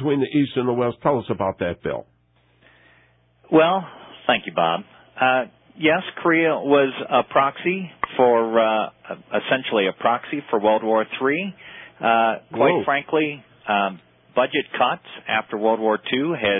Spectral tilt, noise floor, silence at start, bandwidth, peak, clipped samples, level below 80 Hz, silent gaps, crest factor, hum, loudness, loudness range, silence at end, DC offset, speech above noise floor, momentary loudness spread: -10 dB/octave; -60 dBFS; 0 s; 4 kHz; -4 dBFS; under 0.1%; -58 dBFS; none; 16 dB; none; -21 LUFS; 4 LU; 0 s; under 0.1%; 39 dB; 9 LU